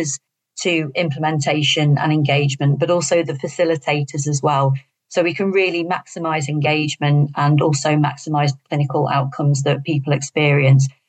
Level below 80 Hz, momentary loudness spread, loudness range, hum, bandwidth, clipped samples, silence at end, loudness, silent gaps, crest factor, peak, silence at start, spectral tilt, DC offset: -72 dBFS; 6 LU; 2 LU; none; 9 kHz; under 0.1%; 0.2 s; -18 LUFS; none; 14 dB; -4 dBFS; 0 s; -5.5 dB/octave; under 0.1%